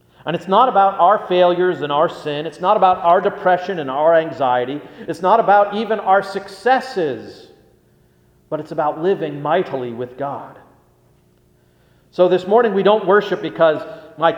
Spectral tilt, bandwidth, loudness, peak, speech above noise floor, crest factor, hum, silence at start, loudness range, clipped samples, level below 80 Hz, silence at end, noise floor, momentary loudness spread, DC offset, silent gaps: -6.5 dB/octave; 11 kHz; -17 LUFS; 0 dBFS; 39 dB; 18 dB; none; 0.25 s; 7 LU; under 0.1%; -62 dBFS; 0 s; -55 dBFS; 13 LU; under 0.1%; none